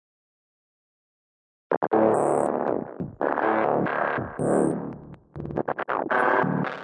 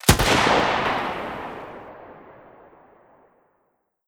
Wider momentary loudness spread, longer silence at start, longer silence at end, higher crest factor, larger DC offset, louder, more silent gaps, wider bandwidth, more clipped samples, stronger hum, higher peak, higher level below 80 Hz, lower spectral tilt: second, 12 LU vs 25 LU; first, 1.7 s vs 0.05 s; second, 0 s vs 1.9 s; second, 18 dB vs 24 dB; neither; second, -25 LUFS vs -21 LUFS; first, 1.77-1.81 s vs none; second, 11 kHz vs over 20 kHz; neither; neither; second, -8 dBFS vs 0 dBFS; second, -60 dBFS vs -38 dBFS; first, -7 dB/octave vs -3.5 dB/octave